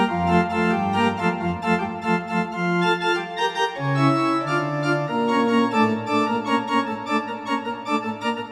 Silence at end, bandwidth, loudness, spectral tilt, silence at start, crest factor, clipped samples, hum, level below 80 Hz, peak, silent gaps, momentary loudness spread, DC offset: 0 s; 12 kHz; -22 LUFS; -6 dB/octave; 0 s; 16 dB; under 0.1%; none; -56 dBFS; -6 dBFS; none; 6 LU; under 0.1%